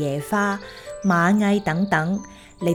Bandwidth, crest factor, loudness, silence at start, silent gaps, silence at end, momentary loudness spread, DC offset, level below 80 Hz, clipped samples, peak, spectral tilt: 16 kHz; 16 dB; -21 LUFS; 0 s; none; 0 s; 11 LU; under 0.1%; -52 dBFS; under 0.1%; -6 dBFS; -6.5 dB/octave